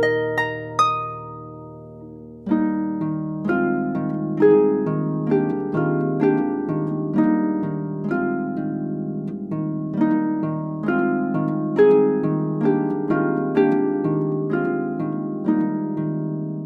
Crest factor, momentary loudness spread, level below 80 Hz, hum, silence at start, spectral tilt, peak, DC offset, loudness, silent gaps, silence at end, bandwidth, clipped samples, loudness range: 16 dB; 9 LU; -58 dBFS; none; 0 s; -8.5 dB/octave; -6 dBFS; under 0.1%; -22 LUFS; none; 0 s; 6.6 kHz; under 0.1%; 5 LU